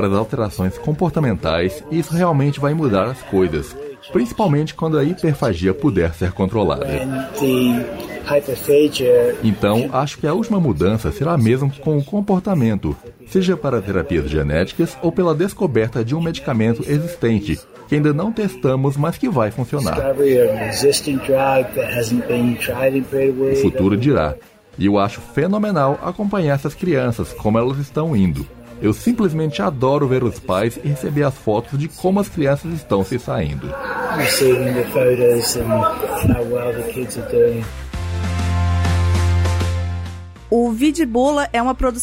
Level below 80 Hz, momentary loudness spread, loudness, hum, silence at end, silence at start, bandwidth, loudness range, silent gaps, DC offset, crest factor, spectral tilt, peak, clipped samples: -36 dBFS; 7 LU; -18 LUFS; none; 0 s; 0 s; 16 kHz; 2 LU; none; under 0.1%; 14 dB; -6.5 dB/octave; -4 dBFS; under 0.1%